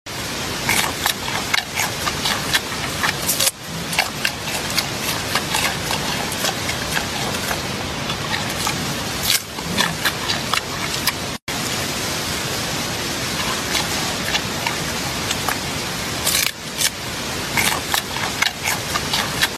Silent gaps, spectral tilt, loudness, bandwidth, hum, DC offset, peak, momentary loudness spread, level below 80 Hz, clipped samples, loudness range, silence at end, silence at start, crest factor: 11.42-11.47 s; -2 dB/octave; -20 LUFS; 15.5 kHz; none; under 0.1%; -2 dBFS; 5 LU; -42 dBFS; under 0.1%; 2 LU; 0 s; 0.05 s; 20 dB